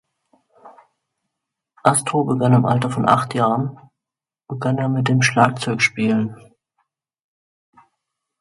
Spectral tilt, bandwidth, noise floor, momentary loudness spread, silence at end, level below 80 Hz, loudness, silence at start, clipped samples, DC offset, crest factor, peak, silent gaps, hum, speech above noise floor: -5.5 dB/octave; 11.5 kHz; -88 dBFS; 8 LU; 2.05 s; -60 dBFS; -18 LUFS; 0.65 s; under 0.1%; under 0.1%; 20 dB; 0 dBFS; none; none; 70 dB